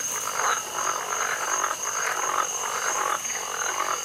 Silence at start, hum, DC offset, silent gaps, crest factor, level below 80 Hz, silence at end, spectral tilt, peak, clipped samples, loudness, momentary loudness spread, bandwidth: 0 s; none; under 0.1%; none; 18 dB; -68 dBFS; 0 s; 1 dB/octave; -10 dBFS; under 0.1%; -25 LUFS; 2 LU; 16 kHz